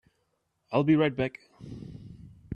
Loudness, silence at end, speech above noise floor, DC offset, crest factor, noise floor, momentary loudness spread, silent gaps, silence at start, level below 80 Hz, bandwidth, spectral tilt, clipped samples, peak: -27 LUFS; 0 s; 49 dB; under 0.1%; 20 dB; -76 dBFS; 23 LU; none; 0.7 s; -60 dBFS; 5.4 kHz; -9 dB/octave; under 0.1%; -10 dBFS